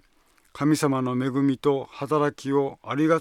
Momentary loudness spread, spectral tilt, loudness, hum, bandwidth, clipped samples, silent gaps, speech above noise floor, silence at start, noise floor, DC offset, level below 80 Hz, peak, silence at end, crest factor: 4 LU; -6.5 dB/octave; -25 LUFS; none; 16 kHz; under 0.1%; none; 38 dB; 0.55 s; -61 dBFS; under 0.1%; -66 dBFS; -8 dBFS; 0 s; 16 dB